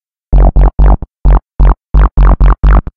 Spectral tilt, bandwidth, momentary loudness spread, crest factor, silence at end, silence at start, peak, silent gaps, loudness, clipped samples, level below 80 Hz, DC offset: -10.5 dB/octave; 3.3 kHz; 4 LU; 6 dB; 0.15 s; 0.3 s; 0 dBFS; none; -11 LUFS; under 0.1%; -6 dBFS; 3%